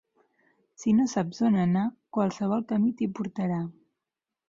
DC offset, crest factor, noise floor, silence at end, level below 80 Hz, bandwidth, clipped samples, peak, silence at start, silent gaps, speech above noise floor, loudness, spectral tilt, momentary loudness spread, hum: under 0.1%; 14 dB; -88 dBFS; 0.75 s; -66 dBFS; 7.6 kHz; under 0.1%; -14 dBFS; 0.8 s; none; 62 dB; -27 LUFS; -7.5 dB/octave; 7 LU; none